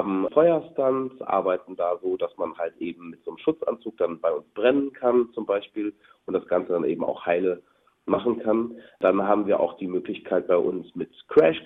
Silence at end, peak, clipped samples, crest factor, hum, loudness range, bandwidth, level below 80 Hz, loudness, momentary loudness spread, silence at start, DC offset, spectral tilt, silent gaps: 0 s; -6 dBFS; under 0.1%; 20 dB; none; 3 LU; 4.1 kHz; -66 dBFS; -25 LUFS; 11 LU; 0 s; under 0.1%; -9 dB/octave; none